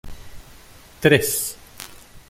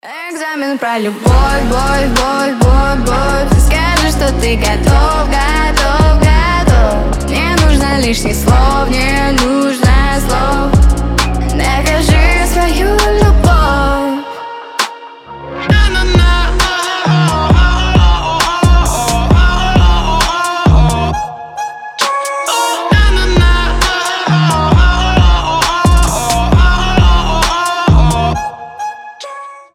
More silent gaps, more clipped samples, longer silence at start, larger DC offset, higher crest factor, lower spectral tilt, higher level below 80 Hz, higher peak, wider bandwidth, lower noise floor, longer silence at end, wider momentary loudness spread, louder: neither; neither; about the same, 0.05 s vs 0.05 s; neither; first, 24 dB vs 10 dB; about the same, -4 dB/octave vs -5 dB/octave; second, -46 dBFS vs -14 dBFS; about the same, 0 dBFS vs 0 dBFS; about the same, 16.5 kHz vs 15.5 kHz; first, -46 dBFS vs -30 dBFS; about the same, 0.1 s vs 0.15 s; first, 22 LU vs 9 LU; second, -19 LUFS vs -11 LUFS